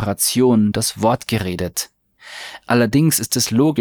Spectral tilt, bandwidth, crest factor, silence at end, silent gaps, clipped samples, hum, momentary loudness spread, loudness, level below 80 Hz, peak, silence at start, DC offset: -4.5 dB/octave; over 20 kHz; 14 dB; 0 s; none; under 0.1%; none; 17 LU; -17 LUFS; -48 dBFS; -2 dBFS; 0 s; under 0.1%